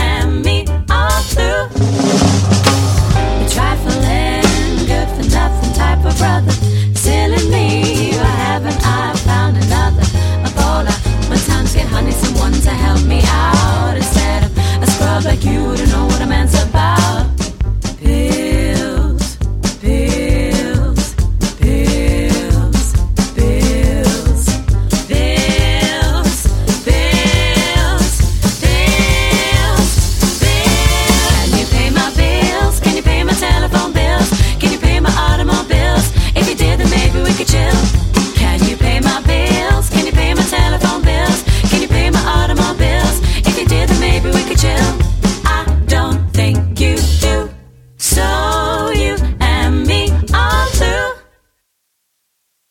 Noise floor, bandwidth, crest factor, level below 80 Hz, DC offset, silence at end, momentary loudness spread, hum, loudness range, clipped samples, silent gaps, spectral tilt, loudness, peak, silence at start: -67 dBFS; 16.5 kHz; 12 dB; -16 dBFS; under 0.1%; 1.5 s; 4 LU; none; 2 LU; under 0.1%; none; -5 dB/octave; -13 LUFS; 0 dBFS; 0 s